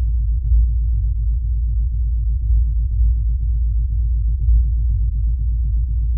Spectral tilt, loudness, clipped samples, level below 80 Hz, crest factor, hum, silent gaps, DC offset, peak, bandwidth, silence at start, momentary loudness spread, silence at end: -26.5 dB/octave; -20 LUFS; under 0.1%; -16 dBFS; 10 dB; none; none; under 0.1%; -6 dBFS; 0.3 kHz; 0 s; 3 LU; 0 s